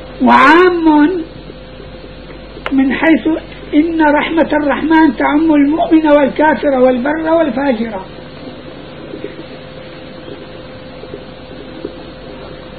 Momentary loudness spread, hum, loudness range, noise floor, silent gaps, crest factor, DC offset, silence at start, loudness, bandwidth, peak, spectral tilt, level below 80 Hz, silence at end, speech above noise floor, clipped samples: 22 LU; none; 19 LU; -31 dBFS; none; 14 dB; 0.8%; 0 s; -11 LUFS; 6.2 kHz; 0 dBFS; -7 dB/octave; -38 dBFS; 0 s; 21 dB; 0.1%